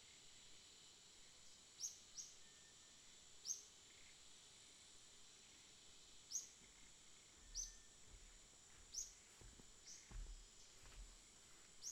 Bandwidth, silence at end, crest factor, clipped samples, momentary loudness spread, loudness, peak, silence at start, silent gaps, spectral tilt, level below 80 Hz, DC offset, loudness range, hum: 16 kHz; 0 s; 26 dB; under 0.1%; 14 LU; -57 LUFS; -34 dBFS; 0 s; none; 0 dB/octave; -68 dBFS; under 0.1%; 3 LU; none